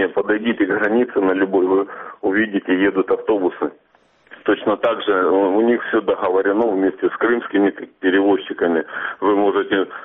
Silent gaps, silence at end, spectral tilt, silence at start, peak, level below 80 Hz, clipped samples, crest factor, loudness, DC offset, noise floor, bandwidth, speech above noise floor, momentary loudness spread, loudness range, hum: none; 0 s; -3.5 dB/octave; 0 s; -4 dBFS; -60 dBFS; under 0.1%; 14 dB; -18 LUFS; under 0.1%; -57 dBFS; 3.9 kHz; 39 dB; 5 LU; 2 LU; none